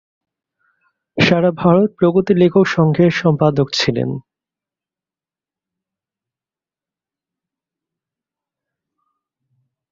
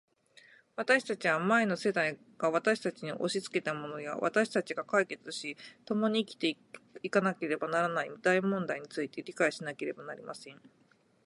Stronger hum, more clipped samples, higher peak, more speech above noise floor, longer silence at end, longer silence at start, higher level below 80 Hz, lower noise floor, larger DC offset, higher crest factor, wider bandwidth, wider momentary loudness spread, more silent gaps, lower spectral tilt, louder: neither; neither; first, 0 dBFS vs -12 dBFS; first, over 76 dB vs 29 dB; first, 5.7 s vs 0.7 s; first, 1.15 s vs 0.8 s; first, -54 dBFS vs -82 dBFS; first, under -90 dBFS vs -61 dBFS; neither; about the same, 18 dB vs 20 dB; second, 7.4 kHz vs 11.5 kHz; second, 8 LU vs 15 LU; neither; first, -6.5 dB/octave vs -4.5 dB/octave; first, -15 LUFS vs -32 LUFS